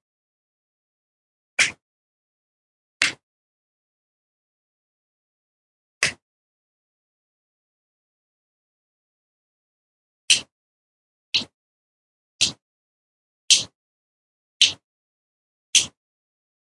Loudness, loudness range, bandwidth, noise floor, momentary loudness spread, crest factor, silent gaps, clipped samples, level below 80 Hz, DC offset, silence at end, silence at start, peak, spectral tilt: -20 LUFS; 11 LU; 11.5 kHz; under -90 dBFS; 11 LU; 30 dB; 1.82-3.00 s, 3.23-6.01 s, 6.22-10.28 s, 10.52-11.32 s, 11.54-12.39 s, 12.62-13.48 s, 13.75-14.60 s, 14.84-15.73 s; under 0.1%; -70 dBFS; under 0.1%; 0.8 s; 1.6 s; 0 dBFS; 1.5 dB/octave